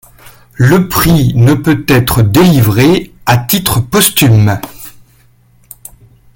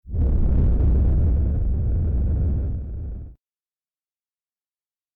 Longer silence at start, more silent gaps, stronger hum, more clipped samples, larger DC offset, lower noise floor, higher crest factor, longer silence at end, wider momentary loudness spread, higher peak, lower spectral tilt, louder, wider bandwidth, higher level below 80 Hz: first, 0.6 s vs 0.05 s; neither; neither; neither; neither; second, -47 dBFS vs under -90 dBFS; about the same, 10 dB vs 8 dB; second, 1.45 s vs 1.85 s; second, 6 LU vs 12 LU; first, 0 dBFS vs -12 dBFS; second, -5.5 dB/octave vs -13 dB/octave; first, -9 LUFS vs -23 LUFS; first, 17.5 kHz vs 1.9 kHz; second, -32 dBFS vs -22 dBFS